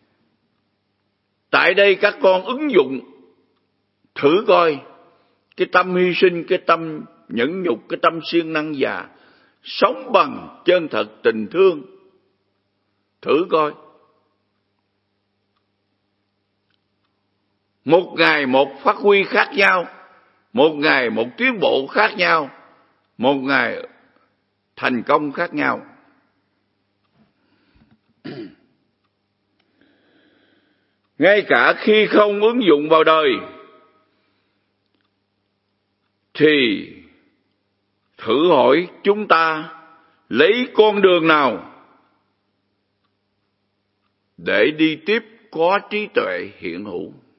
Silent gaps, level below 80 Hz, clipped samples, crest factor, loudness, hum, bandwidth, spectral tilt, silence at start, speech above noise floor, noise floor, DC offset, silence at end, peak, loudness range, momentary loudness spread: none; -72 dBFS; under 0.1%; 20 dB; -17 LUFS; none; 5.8 kHz; -7 dB/octave; 1.55 s; 53 dB; -70 dBFS; under 0.1%; 0.3 s; 0 dBFS; 9 LU; 16 LU